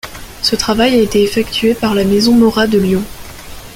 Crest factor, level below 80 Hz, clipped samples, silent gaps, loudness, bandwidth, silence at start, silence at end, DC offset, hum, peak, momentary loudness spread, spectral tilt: 12 dB; -36 dBFS; under 0.1%; none; -12 LUFS; 17 kHz; 0.05 s; 0 s; under 0.1%; none; 0 dBFS; 19 LU; -4.5 dB/octave